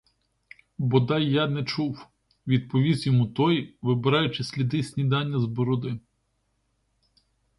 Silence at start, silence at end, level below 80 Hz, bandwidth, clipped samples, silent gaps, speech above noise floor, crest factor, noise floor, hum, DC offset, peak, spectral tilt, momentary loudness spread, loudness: 0.8 s; 1.6 s; -60 dBFS; 11.5 kHz; under 0.1%; none; 49 dB; 18 dB; -73 dBFS; none; under 0.1%; -8 dBFS; -7.5 dB/octave; 9 LU; -25 LUFS